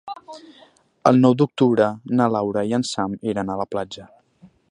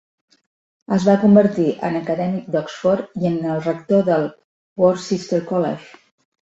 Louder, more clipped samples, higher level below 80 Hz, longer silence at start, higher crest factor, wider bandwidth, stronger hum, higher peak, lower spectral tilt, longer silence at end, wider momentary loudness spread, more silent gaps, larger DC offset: about the same, -20 LUFS vs -19 LUFS; neither; about the same, -60 dBFS vs -60 dBFS; second, 0.05 s vs 0.9 s; about the same, 20 dB vs 18 dB; first, 10.5 kHz vs 8 kHz; neither; about the same, 0 dBFS vs -2 dBFS; about the same, -6.5 dB/octave vs -7.5 dB/octave; second, 0.25 s vs 0.65 s; first, 19 LU vs 10 LU; second, none vs 4.44-4.76 s; neither